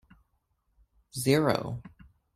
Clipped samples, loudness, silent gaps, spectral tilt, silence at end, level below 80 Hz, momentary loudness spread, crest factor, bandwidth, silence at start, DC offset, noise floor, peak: under 0.1%; -28 LUFS; none; -5.5 dB/octave; 0.5 s; -60 dBFS; 17 LU; 22 dB; 16 kHz; 1.15 s; under 0.1%; -75 dBFS; -10 dBFS